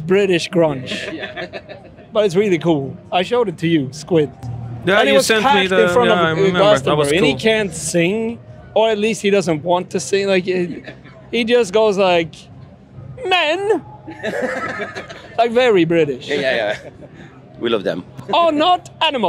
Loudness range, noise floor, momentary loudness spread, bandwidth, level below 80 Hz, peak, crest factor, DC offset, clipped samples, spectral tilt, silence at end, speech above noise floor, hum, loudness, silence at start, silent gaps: 5 LU; -38 dBFS; 14 LU; 16 kHz; -52 dBFS; 0 dBFS; 16 dB; under 0.1%; under 0.1%; -4.5 dB/octave; 0 s; 22 dB; none; -16 LUFS; 0 s; none